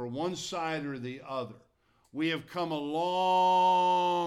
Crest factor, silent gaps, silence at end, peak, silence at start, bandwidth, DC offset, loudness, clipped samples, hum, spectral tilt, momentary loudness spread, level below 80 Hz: 12 dB; none; 0 s; -18 dBFS; 0 s; 13 kHz; under 0.1%; -29 LUFS; under 0.1%; none; -4.5 dB/octave; 14 LU; -72 dBFS